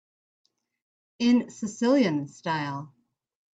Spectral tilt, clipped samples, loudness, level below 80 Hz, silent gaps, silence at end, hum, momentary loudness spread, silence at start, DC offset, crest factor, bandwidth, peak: -5.5 dB/octave; under 0.1%; -26 LUFS; -74 dBFS; none; 0.65 s; none; 12 LU; 1.2 s; under 0.1%; 18 dB; 8 kHz; -12 dBFS